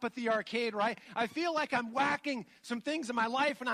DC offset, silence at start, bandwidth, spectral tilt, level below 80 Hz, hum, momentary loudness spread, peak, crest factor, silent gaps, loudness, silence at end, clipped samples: under 0.1%; 0 s; 14.5 kHz; -4 dB/octave; -78 dBFS; none; 7 LU; -16 dBFS; 16 dB; none; -33 LUFS; 0 s; under 0.1%